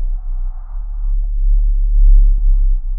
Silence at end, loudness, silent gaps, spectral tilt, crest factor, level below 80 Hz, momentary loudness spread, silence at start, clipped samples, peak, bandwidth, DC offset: 0 s; -19 LUFS; none; -13.5 dB/octave; 10 dB; -12 dBFS; 14 LU; 0 s; under 0.1%; -2 dBFS; 0.8 kHz; under 0.1%